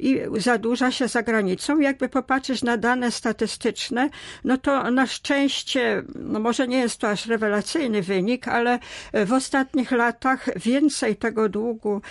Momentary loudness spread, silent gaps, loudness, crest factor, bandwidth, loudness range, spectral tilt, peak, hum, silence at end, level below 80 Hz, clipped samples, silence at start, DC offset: 4 LU; none; -23 LUFS; 14 dB; 11.5 kHz; 1 LU; -4 dB/octave; -8 dBFS; none; 0 s; -56 dBFS; under 0.1%; 0 s; under 0.1%